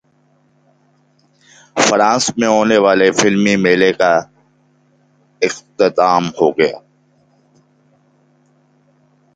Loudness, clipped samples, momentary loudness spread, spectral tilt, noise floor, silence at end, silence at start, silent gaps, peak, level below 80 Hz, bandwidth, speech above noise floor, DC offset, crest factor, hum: -14 LUFS; under 0.1%; 8 LU; -4 dB/octave; -56 dBFS; 2.6 s; 1.75 s; none; 0 dBFS; -56 dBFS; 9.4 kHz; 43 dB; under 0.1%; 16 dB; none